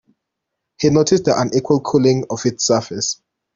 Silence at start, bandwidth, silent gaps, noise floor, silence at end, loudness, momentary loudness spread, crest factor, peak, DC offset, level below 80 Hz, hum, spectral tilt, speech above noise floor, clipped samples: 0.8 s; 7.8 kHz; none; -79 dBFS; 0.4 s; -17 LUFS; 7 LU; 16 dB; -2 dBFS; under 0.1%; -54 dBFS; none; -5 dB/octave; 62 dB; under 0.1%